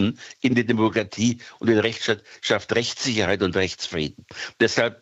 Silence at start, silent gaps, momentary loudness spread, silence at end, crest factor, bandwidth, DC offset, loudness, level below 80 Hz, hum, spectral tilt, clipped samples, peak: 0 s; none; 7 LU; 0.1 s; 18 dB; 8.2 kHz; under 0.1%; -23 LUFS; -56 dBFS; none; -4.5 dB/octave; under 0.1%; -4 dBFS